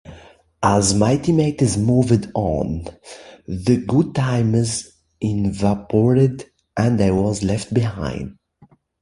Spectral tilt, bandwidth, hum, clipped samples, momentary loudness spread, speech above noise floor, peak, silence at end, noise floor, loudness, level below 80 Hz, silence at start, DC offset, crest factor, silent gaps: -6.5 dB/octave; 11.5 kHz; none; under 0.1%; 15 LU; 35 dB; -2 dBFS; 0.7 s; -53 dBFS; -19 LUFS; -40 dBFS; 0.05 s; under 0.1%; 18 dB; none